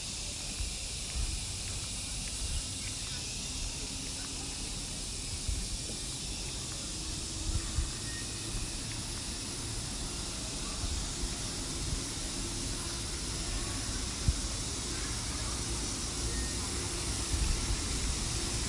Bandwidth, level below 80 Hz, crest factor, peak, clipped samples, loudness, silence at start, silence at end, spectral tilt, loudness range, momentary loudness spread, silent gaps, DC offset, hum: 11.5 kHz; -40 dBFS; 20 dB; -16 dBFS; under 0.1%; -35 LUFS; 0 s; 0 s; -2.5 dB/octave; 3 LU; 4 LU; none; under 0.1%; none